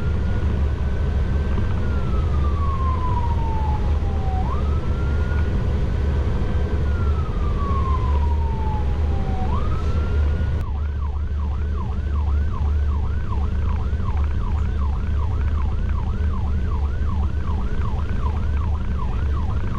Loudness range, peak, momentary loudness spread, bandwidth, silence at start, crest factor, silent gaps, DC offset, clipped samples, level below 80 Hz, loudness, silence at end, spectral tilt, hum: 2 LU; -10 dBFS; 3 LU; 6.2 kHz; 0 s; 10 dB; none; under 0.1%; under 0.1%; -22 dBFS; -23 LUFS; 0 s; -8.5 dB/octave; none